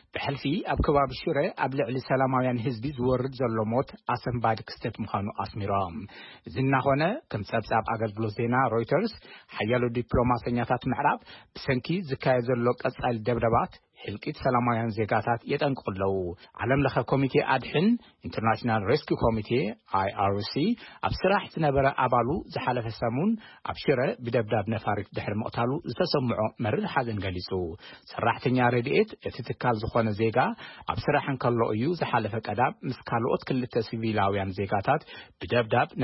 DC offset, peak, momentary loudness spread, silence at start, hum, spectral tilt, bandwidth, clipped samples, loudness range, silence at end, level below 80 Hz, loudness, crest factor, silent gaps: under 0.1%; -10 dBFS; 8 LU; 0.15 s; none; -10.5 dB/octave; 5.8 kHz; under 0.1%; 2 LU; 0 s; -50 dBFS; -28 LUFS; 16 dB; none